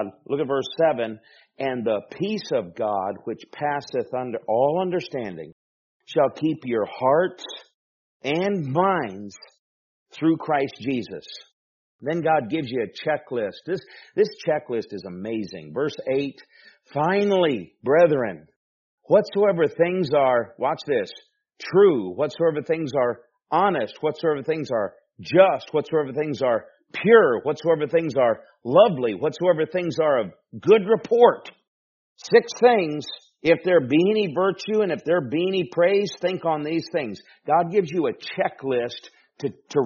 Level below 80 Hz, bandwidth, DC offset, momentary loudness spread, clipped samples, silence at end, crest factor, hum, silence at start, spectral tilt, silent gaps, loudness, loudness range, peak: -68 dBFS; 7.2 kHz; under 0.1%; 15 LU; under 0.1%; 0 s; 22 dB; none; 0 s; -4.5 dB/octave; 5.52-6.00 s, 7.74-8.20 s, 9.59-10.06 s, 11.53-11.99 s, 18.56-18.98 s, 31.67-32.16 s; -23 LUFS; 7 LU; -2 dBFS